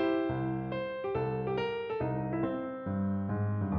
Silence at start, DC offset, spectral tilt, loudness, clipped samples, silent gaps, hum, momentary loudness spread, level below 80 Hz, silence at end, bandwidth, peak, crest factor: 0 s; under 0.1%; -10 dB/octave; -34 LUFS; under 0.1%; none; none; 3 LU; -56 dBFS; 0 s; 5.4 kHz; -18 dBFS; 14 dB